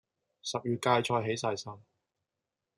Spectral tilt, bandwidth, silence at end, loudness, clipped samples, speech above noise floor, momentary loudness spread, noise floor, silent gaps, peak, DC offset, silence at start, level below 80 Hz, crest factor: -4.5 dB/octave; 13.5 kHz; 1 s; -32 LUFS; under 0.1%; 57 dB; 13 LU; -88 dBFS; none; -12 dBFS; under 0.1%; 0.45 s; -76 dBFS; 22 dB